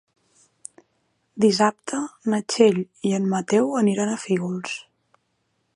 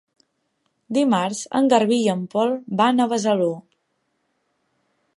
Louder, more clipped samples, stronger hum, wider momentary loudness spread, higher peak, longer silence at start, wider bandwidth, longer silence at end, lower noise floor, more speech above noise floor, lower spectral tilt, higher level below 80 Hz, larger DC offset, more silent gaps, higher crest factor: about the same, -22 LUFS vs -20 LUFS; neither; neither; first, 23 LU vs 7 LU; about the same, -2 dBFS vs -2 dBFS; first, 1.35 s vs 0.9 s; about the same, 11.5 kHz vs 11.5 kHz; second, 0.95 s vs 1.55 s; about the same, -72 dBFS vs -72 dBFS; about the same, 50 dB vs 52 dB; about the same, -5 dB/octave vs -5 dB/octave; about the same, -72 dBFS vs -74 dBFS; neither; neither; about the same, 20 dB vs 20 dB